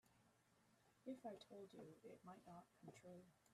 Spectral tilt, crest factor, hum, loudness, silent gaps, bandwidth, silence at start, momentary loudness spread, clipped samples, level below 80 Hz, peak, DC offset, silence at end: -6 dB/octave; 18 dB; none; -61 LUFS; none; 13 kHz; 0.05 s; 8 LU; under 0.1%; under -90 dBFS; -42 dBFS; under 0.1%; 0 s